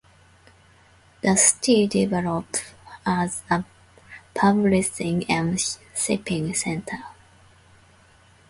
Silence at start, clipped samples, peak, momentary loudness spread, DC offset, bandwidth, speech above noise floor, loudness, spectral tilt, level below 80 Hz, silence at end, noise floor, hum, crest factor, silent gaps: 1.25 s; under 0.1%; -2 dBFS; 14 LU; under 0.1%; 11.5 kHz; 32 dB; -22 LUFS; -4 dB/octave; -54 dBFS; 1.4 s; -55 dBFS; none; 22 dB; none